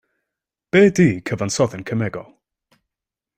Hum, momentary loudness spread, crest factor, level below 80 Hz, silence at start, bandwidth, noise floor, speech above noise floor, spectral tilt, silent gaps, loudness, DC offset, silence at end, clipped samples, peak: none; 11 LU; 18 dB; -54 dBFS; 0.75 s; 15.5 kHz; -87 dBFS; 69 dB; -6 dB/octave; none; -18 LUFS; under 0.1%; 1.15 s; under 0.1%; -2 dBFS